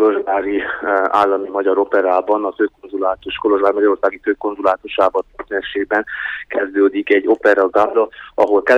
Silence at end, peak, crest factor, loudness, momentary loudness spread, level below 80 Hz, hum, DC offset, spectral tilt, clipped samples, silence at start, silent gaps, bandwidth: 0 s; -2 dBFS; 14 dB; -17 LUFS; 8 LU; -54 dBFS; none; under 0.1%; -5.5 dB/octave; under 0.1%; 0 s; none; 7 kHz